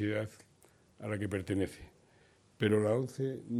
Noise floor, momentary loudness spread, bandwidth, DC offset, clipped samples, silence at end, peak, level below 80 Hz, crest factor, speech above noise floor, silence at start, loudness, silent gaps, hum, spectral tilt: -65 dBFS; 14 LU; 13.5 kHz; under 0.1%; under 0.1%; 0 s; -16 dBFS; -66 dBFS; 20 dB; 32 dB; 0 s; -34 LUFS; none; none; -7 dB/octave